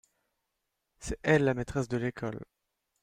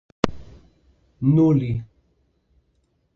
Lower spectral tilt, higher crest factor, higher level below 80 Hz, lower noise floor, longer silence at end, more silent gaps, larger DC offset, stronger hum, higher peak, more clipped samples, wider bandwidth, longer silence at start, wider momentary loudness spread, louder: second, -6.5 dB/octave vs -8.5 dB/octave; about the same, 22 dB vs 24 dB; about the same, -52 dBFS vs -48 dBFS; first, -83 dBFS vs -67 dBFS; second, 0.6 s vs 1.3 s; neither; neither; neither; second, -10 dBFS vs 0 dBFS; neither; first, 13.5 kHz vs 7.2 kHz; first, 1 s vs 0.25 s; first, 16 LU vs 11 LU; second, -30 LUFS vs -21 LUFS